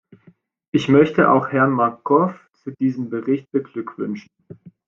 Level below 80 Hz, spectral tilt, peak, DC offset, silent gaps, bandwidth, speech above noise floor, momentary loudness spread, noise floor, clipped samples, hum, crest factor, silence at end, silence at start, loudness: -62 dBFS; -8 dB/octave; -2 dBFS; under 0.1%; none; 7.2 kHz; 35 dB; 14 LU; -54 dBFS; under 0.1%; none; 18 dB; 0.2 s; 0.75 s; -19 LUFS